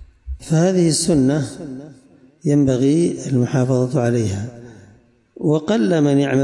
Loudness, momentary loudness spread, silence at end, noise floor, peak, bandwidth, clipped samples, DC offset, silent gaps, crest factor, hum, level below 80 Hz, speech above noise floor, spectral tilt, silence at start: -18 LUFS; 16 LU; 0 s; -51 dBFS; -6 dBFS; 11.5 kHz; under 0.1%; under 0.1%; none; 12 dB; none; -44 dBFS; 34 dB; -6.5 dB/octave; 0 s